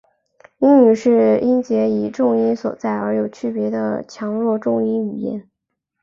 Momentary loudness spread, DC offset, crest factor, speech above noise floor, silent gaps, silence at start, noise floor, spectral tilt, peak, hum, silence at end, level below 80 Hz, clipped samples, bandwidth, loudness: 12 LU; under 0.1%; 16 dB; 60 dB; none; 0.6 s; -77 dBFS; -8 dB/octave; -2 dBFS; none; 0.6 s; -62 dBFS; under 0.1%; 7.4 kHz; -18 LUFS